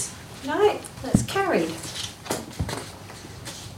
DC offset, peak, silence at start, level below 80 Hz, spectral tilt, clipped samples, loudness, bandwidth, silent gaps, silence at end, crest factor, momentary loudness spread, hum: under 0.1%; -6 dBFS; 0 s; -46 dBFS; -4.5 dB/octave; under 0.1%; -26 LUFS; 16 kHz; none; 0 s; 22 dB; 15 LU; none